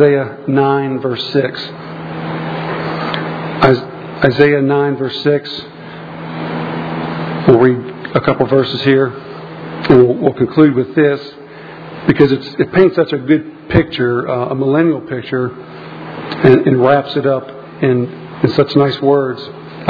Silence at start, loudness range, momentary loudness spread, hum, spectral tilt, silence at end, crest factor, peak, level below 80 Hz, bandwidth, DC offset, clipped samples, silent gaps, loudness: 0 s; 4 LU; 17 LU; none; -9 dB/octave; 0 s; 14 dB; 0 dBFS; -44 dBFS; 5.4 kHz; under 0.1%; 0.2%; none; -14 LUFS